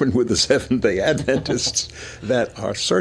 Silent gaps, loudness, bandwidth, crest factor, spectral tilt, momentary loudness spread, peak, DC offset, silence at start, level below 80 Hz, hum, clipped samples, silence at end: none; -20 LUFS; 11 kHz; 16 dB; -3.5 dB/octave; 6 LU; -4 dBFS; under 0.1%; 0 s; -44 dBFS; none; under 0.1%; 0 s